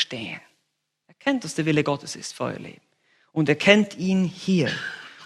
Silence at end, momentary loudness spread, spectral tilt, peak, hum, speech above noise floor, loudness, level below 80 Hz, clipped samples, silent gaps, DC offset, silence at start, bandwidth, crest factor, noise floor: 0 s; 17 LU; -5 dB/octave; 0 dBFS; none; 53 dB; -23 LUFS; -66 dBFS; under 0.1%; none; under 0.1%; 0 s; 12 kHz; 24 dB; -76 dBFS